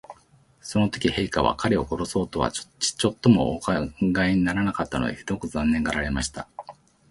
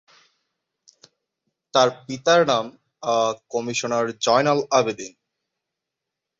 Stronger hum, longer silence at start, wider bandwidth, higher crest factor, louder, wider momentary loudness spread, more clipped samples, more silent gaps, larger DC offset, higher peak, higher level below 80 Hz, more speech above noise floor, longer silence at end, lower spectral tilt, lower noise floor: neither; second, 0.1 s vs 1.75 s; first, 11.5 kHz vs 7.8 kHz; about the same, 20 dB vs 20 dB; second, -24 LUFS vs -21 LUFS; second, 8 LU vs 11 LU; neither; neither; neither; about the same, -4 dBFS vs -4 dBFS; first, -42 dBFS vs -66 dBFS; second, 34 dB vs 63 dB; second, 0.4 s vs 1.3 s; first, -5 dB/octave vs -3.5 dB/octave; second, -58 dBFS vs -84 dBFS